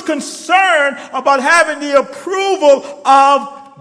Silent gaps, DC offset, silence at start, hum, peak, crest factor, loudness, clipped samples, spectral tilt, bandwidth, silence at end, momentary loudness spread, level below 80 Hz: none; under 0.1%; 0 s; none; 0 dBFS; 12 dB; -12 LUFS; under 0.1%; -1.5 dB/octave; 11 kHz; 0.15 s; 10 LU; -62 dBFS